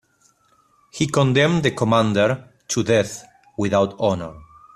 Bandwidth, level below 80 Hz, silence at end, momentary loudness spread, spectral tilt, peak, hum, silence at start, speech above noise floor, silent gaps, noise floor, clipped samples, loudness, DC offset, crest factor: 13.5 kHz; -54 dBFS; 0.35 s; 15 LU; -5.5 dB/octave; -4 dBFS; none; 0.95 s; 41 dB; none; -60 dBFS; under 0.1%; -20 LUFS; under 0.1%; 18 dB